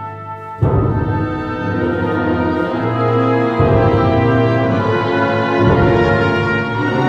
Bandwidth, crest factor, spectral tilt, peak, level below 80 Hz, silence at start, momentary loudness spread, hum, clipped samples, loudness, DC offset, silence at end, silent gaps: 7.4 kHz; 14 dB; -8.5 dB/octave; -2 dBFS; -32 dBFS; 0 s; 7 LU; none; under 0.1%; -15 LUFS; under 0.1%; 0 s; none